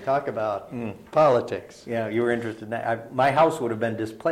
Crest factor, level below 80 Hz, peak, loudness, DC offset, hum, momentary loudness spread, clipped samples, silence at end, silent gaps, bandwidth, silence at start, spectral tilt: 16 dB; -62 dBFS; -8 dBFS; -25 LUFS; under 0.1%; none; 12 LU; under 0.1%; 0 s; none; 14.5 kHz; 0 s; -6.5 dB/octave